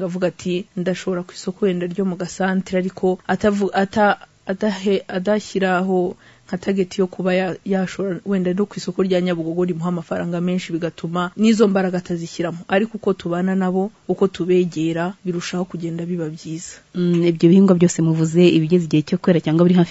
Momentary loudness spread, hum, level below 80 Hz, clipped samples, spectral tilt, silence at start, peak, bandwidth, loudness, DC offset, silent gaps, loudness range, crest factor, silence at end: 11 LU; none; -56 dBFS; under 0.1%; -6.5 dB/octave; 0 s; -2 dBFS; 8 kHz; -20 LUFS; under 0.1%; none; 5 LU; 18 dB; 0 s